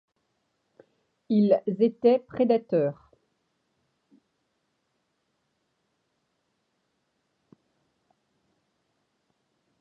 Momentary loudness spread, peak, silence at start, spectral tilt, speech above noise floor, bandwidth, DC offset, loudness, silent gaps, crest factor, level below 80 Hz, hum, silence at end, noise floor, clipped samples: 5 LU; -8 dBFS; 1.3 s; -10.5 dB/octave; 53 dB; 5.2 kHz; under 0.1%; -24 LUFS; none; 22 dB; -76 dBFS; none; 6.9 s; -76 dBFS; under 0.1%